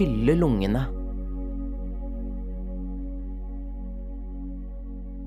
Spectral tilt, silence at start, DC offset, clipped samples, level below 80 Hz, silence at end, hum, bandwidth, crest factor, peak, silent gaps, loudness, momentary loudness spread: -8.5 dB/octave; 0 s; under 0.1%; under 0.1%; -32 dBFS; 0 s; none; 8.8 kHz; 20 dB; -8 dBFS; none; -30 LUFS; 16 LU